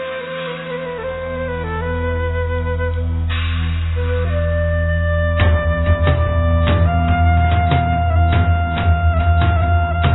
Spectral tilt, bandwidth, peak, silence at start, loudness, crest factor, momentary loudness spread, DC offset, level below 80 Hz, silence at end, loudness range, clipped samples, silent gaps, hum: -11 dB/octave; 4.1 kHz; -2 dBFS; 0 s; -18 LUFS; 14 dB; 9 LU; under 0.1%; -22 dBFS; 0 s; 6 LU; under 0.1%; none; none